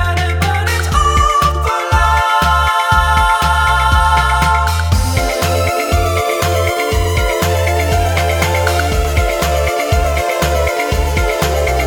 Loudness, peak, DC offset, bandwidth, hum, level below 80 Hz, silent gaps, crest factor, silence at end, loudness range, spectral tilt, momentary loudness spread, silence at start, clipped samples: -14 LUFS; 0 dBFS; under 0.1%; over 20 kHz; none; -20 dBFS; none; 14 dB; 0 s; 3 LU; -4.5 dB/octave; 4 LU; 0 s; under 0.1%